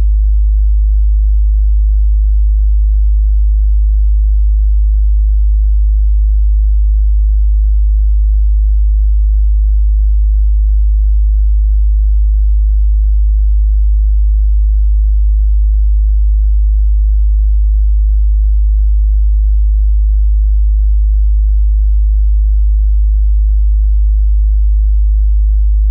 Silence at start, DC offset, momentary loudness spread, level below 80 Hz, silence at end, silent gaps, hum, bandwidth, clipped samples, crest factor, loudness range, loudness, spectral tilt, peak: 0 s; under 0.1%; 0 LU; -8 dBFS; 0 s; none; none; 0.2 kHz; under 0.1%; 4 dB; 0 LU; -13 LUFS; -26.5 dB/octave; -4 dBFS